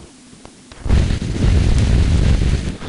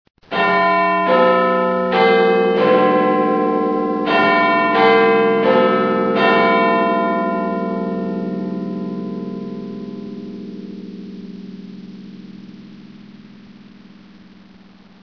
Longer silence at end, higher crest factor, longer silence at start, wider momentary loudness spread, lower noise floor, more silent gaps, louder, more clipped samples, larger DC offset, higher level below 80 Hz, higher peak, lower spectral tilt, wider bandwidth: second, 0 s vs 1.45 s; second, 12 dB vs 18 dB; second, 0 s vs 0.3 s; second, 5 LU vs 20 LU; second, -41 dBFS vs -45 dBFS; neither; about the same, -17 LUFS vs -16 LUFS; neither; neither; first, -18 dBFS vs -60 dBFS; second, -4 dBFS vs 0 dBFS; about the same, -6.5 dB/octave vs -7.5 dB/octave; first, 11 kHz vs 5.4 kHz